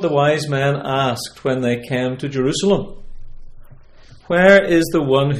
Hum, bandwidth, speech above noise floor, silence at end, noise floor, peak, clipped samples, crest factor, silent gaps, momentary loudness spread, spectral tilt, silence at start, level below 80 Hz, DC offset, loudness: none; 16 kHz; 26 dB; 0 s; -42 dBFS; 0 dBFS; under 0.1%; 18 dB; none; 11 LU; -5.5 dB/octave; 0 s; -40 dBFS; under 0.1%; -17 LUFS